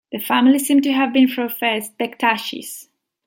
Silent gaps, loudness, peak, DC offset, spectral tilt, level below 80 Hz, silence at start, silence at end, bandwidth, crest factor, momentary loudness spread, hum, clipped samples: none; -18 LUFS; -2 dBFS; under 0.1%; -3 dB/octave; -70 dBFS; 0.1 s; 0.45 s; 17 kHz; 16 dB; 14 LU; none; under 0.1%